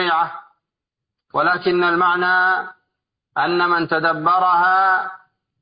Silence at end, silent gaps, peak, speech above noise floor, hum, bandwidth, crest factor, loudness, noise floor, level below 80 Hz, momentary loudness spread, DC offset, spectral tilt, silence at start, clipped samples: 0.45 s; none; -4 dBFS; 67 dB; none; 5.2 kHz; 14 dB; -17 LUFS; -84 dBFS; -66 dBFS; 11 LU; under 0.1%; -9.5 dB/octave; 0 s; under 0.1%